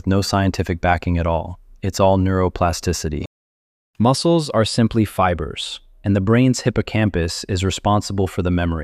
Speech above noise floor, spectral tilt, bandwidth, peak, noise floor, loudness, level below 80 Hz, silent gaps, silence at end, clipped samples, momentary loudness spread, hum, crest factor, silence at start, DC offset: over 72 dB; -6 dB/octave; 15 kHz; -2 dBFS; under -90 dBFS; -19 LUFS; -36 dBFS; 3.27-3.94 s; 0 s; under 0.1%; 11 LU; none; 16 dB; 0.05 s; under 0.1%